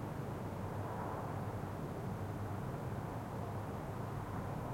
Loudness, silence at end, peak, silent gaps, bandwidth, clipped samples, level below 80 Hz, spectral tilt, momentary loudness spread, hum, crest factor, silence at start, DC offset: -43 LUFS; 0 s; -30 dBFS; none; 16.5 kHz; under 0.1%; -58 dBFS; -7.5 dB/octave; 1 LU; none; 12 dB; 0 s; under 0.1%